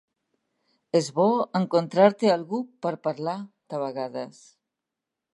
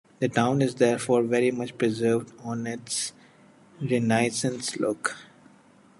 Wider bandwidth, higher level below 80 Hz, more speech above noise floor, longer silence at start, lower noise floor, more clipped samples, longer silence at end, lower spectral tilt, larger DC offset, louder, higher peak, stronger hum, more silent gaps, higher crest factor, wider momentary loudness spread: about the same, 11.5 kHz vs 11.5 kHz; second, -80 dBFS vs -68 dBFS; first, 62 dB vs 31 dB; first, 0.95 s vs 0.2 s; first, -86 dBFS vs -56 dBFS; neither; first, 1.05 s vs 0.75 s; about the same, -6 dB/octave vs -5 dB/octave; neither; about the same, -25 LUFS vs -26 LUFS; about the same, -4 dBFS vs -6 dBFS; neither; neither; about the same, 22 dB vs 20 dB; first, 15 LU vs 10 LU